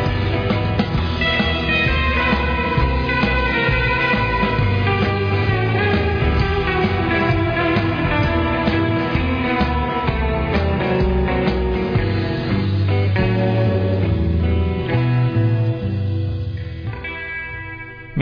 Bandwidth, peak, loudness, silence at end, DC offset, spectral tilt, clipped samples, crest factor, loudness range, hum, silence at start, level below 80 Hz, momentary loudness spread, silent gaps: 5.2 kHz; -6 dBFS; -19 LUFS; 0 s; under 0.1%; -8.5 dB/octave; under 0.1%; 12 dB; 2 LU; none; 0 s; -26 dBFS; 5 LU; none